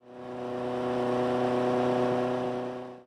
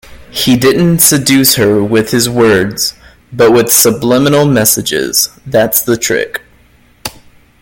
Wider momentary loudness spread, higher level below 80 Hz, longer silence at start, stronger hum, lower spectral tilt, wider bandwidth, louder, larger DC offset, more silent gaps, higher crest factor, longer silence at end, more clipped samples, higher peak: second, 10 LU vs 14 LU; second, -64 dBFS vs -42 dBFS; about the same, 0.05 s vs 0.1 s; neither; first, -7 dB/octave vs -3.5 dB/octave; second, 11.5 kHz vs over 20 kHz; second, -29 LUFS vs -9 LUFS; neither; neither; about the same, 12 dB vs 10 dB; second, 0.05 s vs 0.5 s; second, under 0.1% vs 0.2%; second, -18 dBFS vs 0 dBFS